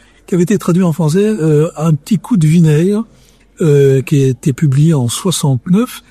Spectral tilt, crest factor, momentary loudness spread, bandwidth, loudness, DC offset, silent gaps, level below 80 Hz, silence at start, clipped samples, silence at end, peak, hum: -7 dB/octave; 12 dB; 6 LU; 14 kHz; -12 LUFS; under 0.1%; none; -46 dBFS; 0.3 s; under 0.1%; 0.1 s; 0 dBFS; none